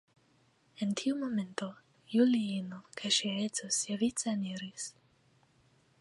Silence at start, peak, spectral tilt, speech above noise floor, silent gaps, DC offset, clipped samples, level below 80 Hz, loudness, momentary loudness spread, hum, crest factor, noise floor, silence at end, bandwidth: 0.8 s; -16 dBFS; -3.5 dB/octave; 36 dB; none; under 0.1%; under 0.1%; -76 dBFS; -33 LUFS; 13 LU; none; 20 dB; -69 dBFS; 1.1 s; 11.5 kHz